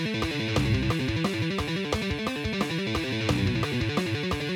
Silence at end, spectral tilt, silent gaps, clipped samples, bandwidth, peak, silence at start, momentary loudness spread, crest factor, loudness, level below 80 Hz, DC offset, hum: 0 s; -5.5 dB/octave; none; under 0.1%; 18 kHz; -10 dBFS; 0 s; 3 LU; 16 dB; -27 LUFS; -42 dBFS; under 0.1%; none